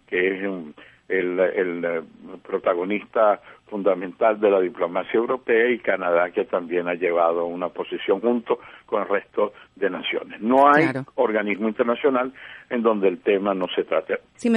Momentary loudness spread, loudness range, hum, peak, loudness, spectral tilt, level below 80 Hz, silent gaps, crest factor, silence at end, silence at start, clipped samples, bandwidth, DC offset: 9 LU; 3 LU; none; -4 dBFS; -22 LUFS; -6.5 dB/octave; -66 dBFS; none; 18 dB; 0 s; 0.1 s; under 0.1%; 10.5 kHz; under 0.1%